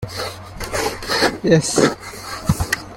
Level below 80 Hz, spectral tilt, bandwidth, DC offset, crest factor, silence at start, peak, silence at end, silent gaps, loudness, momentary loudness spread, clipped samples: -38 dBFS; -4 dB/octave; 17 kHz; under 0.1%; 18 dB; 0 s; -2 dBFS; 0 s; none; -19 LUFS; 14 LU; under 0.1%